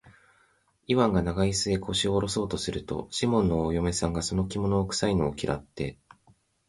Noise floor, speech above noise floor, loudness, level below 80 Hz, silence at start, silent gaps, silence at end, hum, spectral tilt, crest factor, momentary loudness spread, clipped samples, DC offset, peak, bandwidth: -66 dBFS; 39 dB; -27 LUFS; -44 dBFS; 0.05 s; none; 0.75 s; none; -5 dB/octave; 18 dB; 8 LU; under 0.1%; under 0.1%; -10 dBFS; 11.5 kHz